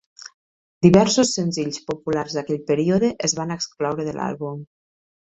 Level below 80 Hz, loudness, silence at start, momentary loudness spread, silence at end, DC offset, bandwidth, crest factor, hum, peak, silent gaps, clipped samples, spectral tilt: -54 dBFS; -21 LUFS; 0.2 s; 15 LU; 0.55 s; under 0.1%; 8.4 kHz; 20 dB; none; -2 dBFS; 0.34-0.81 s; under 0.1%; -5 dB/octave